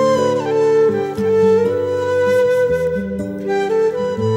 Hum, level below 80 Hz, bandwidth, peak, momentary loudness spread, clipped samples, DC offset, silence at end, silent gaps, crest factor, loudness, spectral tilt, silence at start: none; -50 dBFS; 13.5 kHz; -4 dBFS; 7 LU; under 0.1%; under 0.1%; 0 s; none; 12 dB; -16 LUFS; -6.5 dB/octave; 0 s